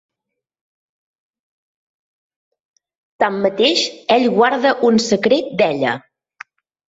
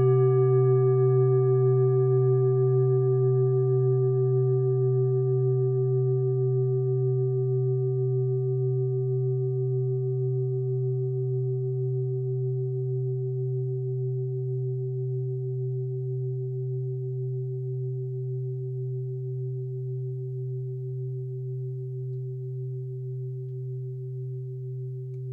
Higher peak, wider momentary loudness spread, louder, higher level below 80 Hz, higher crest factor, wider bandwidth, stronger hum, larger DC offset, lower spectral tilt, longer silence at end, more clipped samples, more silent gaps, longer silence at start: first, -2 dBFS vs -14 dBFS; second, 6 LU vs 12 LU; first, -16 LUFS vs -27 LUFS; first, -62 dBFS vs -70 dBFS; first, 18 dB vs 12 dB; first, 8 kHz vs 2.3 kHz; neither; neither; second, -4 dB/octave vs -14 dB/octave; first, 0.95 s vs 0 s; neither; neither; first, 3.2 s vs 0 s